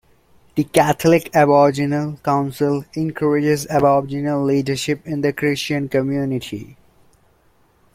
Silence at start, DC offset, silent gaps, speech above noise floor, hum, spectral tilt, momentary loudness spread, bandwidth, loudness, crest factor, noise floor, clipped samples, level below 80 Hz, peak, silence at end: 0.55 s; under 0.1%; none; 39 dB; none; -6 dB/octave; 9 LU; 16 kHz; -18 LUFS; 18 dB; -57 dBFS; under 0.1%; -52 dBFS; -2 dBFS; 1.25 s